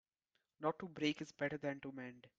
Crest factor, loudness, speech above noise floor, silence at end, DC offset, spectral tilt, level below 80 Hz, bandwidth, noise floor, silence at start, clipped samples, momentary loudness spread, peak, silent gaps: 22 dB; -43 LUFS; 44 dB; 0.1 s; under 0.1%; -5.5 dB/octave; -80 dBFS; 7.8 kHz; -87 dBFS; 0.6 s; under 0.1%; 9 LU; -24 dBFS; none